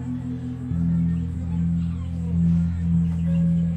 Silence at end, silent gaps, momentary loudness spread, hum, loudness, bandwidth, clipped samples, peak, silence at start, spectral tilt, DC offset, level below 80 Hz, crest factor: 0 s; none; 8 LU; none; -24 LUFS; 3.6 kHz; under 0.1%; -12 dBFS; 0 s; -10 dB/octave; under 0.1%; -40 dBFS; 10 dB